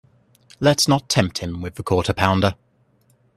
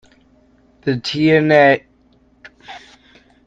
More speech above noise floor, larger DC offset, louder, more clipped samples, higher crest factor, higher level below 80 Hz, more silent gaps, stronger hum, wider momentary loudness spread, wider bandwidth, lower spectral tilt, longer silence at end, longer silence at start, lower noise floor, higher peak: about the same, 41 dB vs 41 dB; neither; second, -20 LUFS vs -15 LUFS; neither; about the same, 22 dB vs 18 dB; first, -48 dBFS vs -56 dBFS; neither; second, none vs 60 Hz at -50 dBFS; second, 12 LU vs 26 LU; first, 14 kHz vs 7.8 kHz; second, -4.5 dB/octave vs -6.5 dB/octave; first, 0.85 s vs 0.7 s; second, 0.6 s vs 0.85 s; first, -60 dBFS vs -54 dBFS; about the same, 0 dBFS vs 0 dBFS